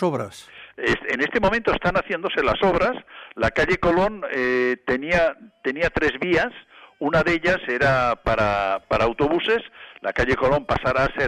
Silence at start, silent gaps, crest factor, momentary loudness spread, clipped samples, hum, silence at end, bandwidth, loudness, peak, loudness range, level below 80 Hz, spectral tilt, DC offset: 0 s; none; 14 dB; 9 LU; under 0.1%; none; 0 s; 12 kHz; -22 LUFS; -8 dBFS; 1 LU; -40 dBFS; -6 dB/octave; under 0.1%